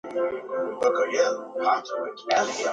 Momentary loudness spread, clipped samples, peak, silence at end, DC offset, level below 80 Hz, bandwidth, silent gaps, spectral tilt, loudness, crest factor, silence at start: 7 LU; under 0.1%; -6 dBFS; 0 s; under 0.1%; -72 dBFS; 9.2 kHz; none; -2 dB/octave; -26 LUFS; 20 dB; 0.05 s